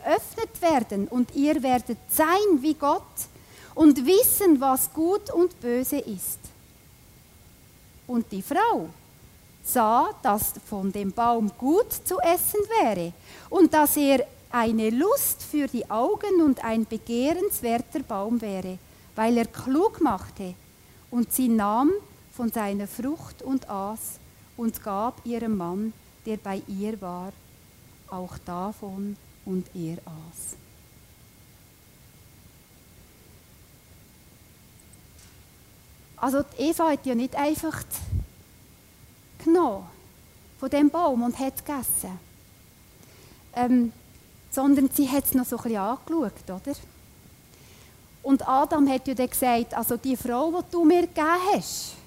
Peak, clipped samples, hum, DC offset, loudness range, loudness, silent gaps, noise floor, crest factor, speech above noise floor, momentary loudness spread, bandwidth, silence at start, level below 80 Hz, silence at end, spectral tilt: -6 dBFS; under 0.1%; none; under 0.1%; 13 LU; -25 LUFS; none; -53 dBFS; 20 dB; 29 dB; 15 LU; 16 kHz; 0 s; -52 dBFS; 0.1 s; -4.5 dB/octave